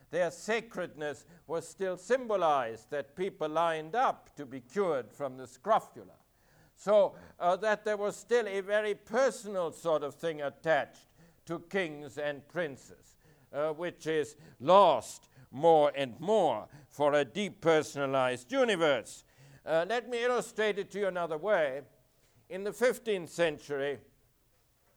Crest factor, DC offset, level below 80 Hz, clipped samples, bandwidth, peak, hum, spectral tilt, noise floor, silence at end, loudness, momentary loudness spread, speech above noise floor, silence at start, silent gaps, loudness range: 22 dB; under 0.1%; -72 dBFS; under 0.1%; over 20 kHz; -8 dBFS; none; -4.5 dB/octave; -70 dBFS; 0.95 s; -31 LUFS; 14 LU; 39 dB; 0.1 s; none; 7 LU